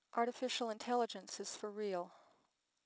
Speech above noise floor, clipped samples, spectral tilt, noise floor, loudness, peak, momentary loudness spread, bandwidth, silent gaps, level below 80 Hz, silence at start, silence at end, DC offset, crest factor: 40 dB; under 0.1%; -3 dB/octave; -80 dBFS; -41 LUFS; -22 dBFS; 7 LU; 8 kHz; none; under -90 dBFS; 0.15 s; 0.7 s; under 0.1%; 20 dB